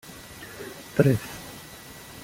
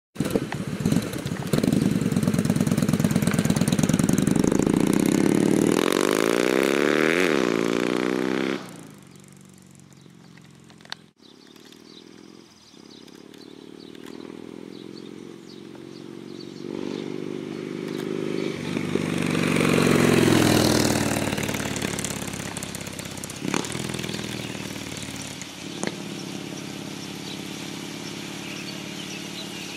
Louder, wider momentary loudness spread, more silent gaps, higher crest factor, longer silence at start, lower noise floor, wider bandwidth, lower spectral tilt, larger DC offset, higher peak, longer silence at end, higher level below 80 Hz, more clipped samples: about the same, -25 LUFS vs -24 LUFS; about the same, 20 LU vs 20 LU; neither; about the same, 24 dB vs 20 dB; about the same, 0.1 s vs 0.15 s; second, -44 dBFS vs -51 dBFS; about the same, 17 kHz vs 16 kHz; first, -6.5 dB/octave vs -5 dB/octave; neither; about the same, -4 dBFS vs -6 dBFS; about the same, 0.05 s vs 0 s; about the same, -54 dBFS vs -52 dBFS; neither